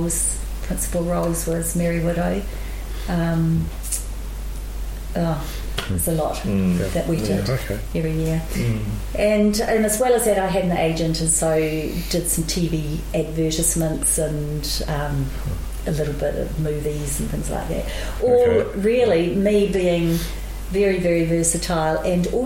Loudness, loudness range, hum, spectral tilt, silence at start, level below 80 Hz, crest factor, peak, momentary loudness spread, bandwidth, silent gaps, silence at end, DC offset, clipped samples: -21 LUFS; 6 LU; none; -5 dB/octave; 0 s; -30 dBFS; 16 dB; -6 dBFS; 10 LU; 17 kHz; none; 0 s; under 0.1%; under 0.1%